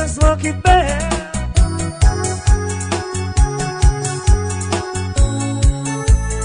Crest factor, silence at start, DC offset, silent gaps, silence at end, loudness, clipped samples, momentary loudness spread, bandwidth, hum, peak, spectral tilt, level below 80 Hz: 14 dB; 0 s; under 0.1%; none; 0 s; -17 LUFS; under 0.1%; 7 LU; 10.5 kHz; none; -2 dBFS; -5 dB/octave; -18 dBFS